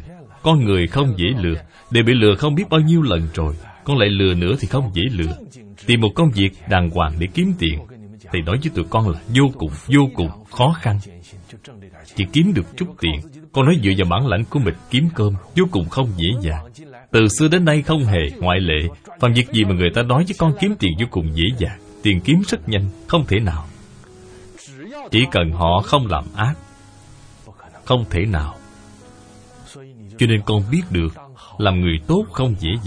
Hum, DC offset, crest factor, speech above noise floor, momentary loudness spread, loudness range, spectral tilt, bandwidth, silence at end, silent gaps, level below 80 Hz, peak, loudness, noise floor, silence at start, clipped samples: none; under 0.1%; 18 dB; 26 dB; 10 LU; 5 LU; -6 dB/octave; 10.5 kHz; 0 s; none; -34 dBFS; 0 dBFS; -18 LUFS; -43 dBFS; 0 s; under 0.1%